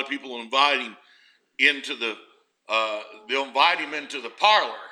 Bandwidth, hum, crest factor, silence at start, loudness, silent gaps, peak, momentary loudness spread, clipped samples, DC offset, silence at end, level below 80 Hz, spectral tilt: 11.5 kHz; none; 22 dB; 0 s; -23 LUFS; none; -2 dBFS; 15 LU; under 0.1%; under 0.1%; 0 s; -90 dBFS; -0.5 dB/octave